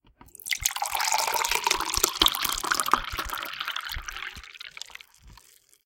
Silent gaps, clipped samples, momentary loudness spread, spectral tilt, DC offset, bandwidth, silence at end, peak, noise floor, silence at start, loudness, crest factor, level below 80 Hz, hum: none; under 0.1%; 19 LU; 0 dB/octave; under 0.1%; 17 kHz; 0.5 s; 0 dBFS; -57 dBFS; 0.2 s; -26 LUFS; 30 dB; -46 dBFS; none